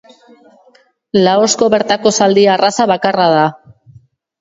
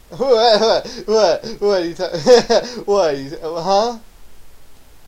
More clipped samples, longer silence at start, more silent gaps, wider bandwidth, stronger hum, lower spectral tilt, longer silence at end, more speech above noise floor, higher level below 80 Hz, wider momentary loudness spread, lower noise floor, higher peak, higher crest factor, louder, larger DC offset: neither; first, 1.15 s vs 0.1 s; neither; second, 8 kHz vs 15 kHz; neither; about the same, -4 dB/octave vs -3.5 dB/octave; first, 0.9 s vs 0 s; first, 33 dB vs 23 dB; second, -56 dBFS vs -44 dBFS; second, 4 LU vs 11 LU; first, -45 dBFS vs -39 dBFS; about the same, 0 dBFS vs 0 dBFS; about the same, 14 dB vs 16 dB; first, -12 LUFS vs -16 LUFS; neither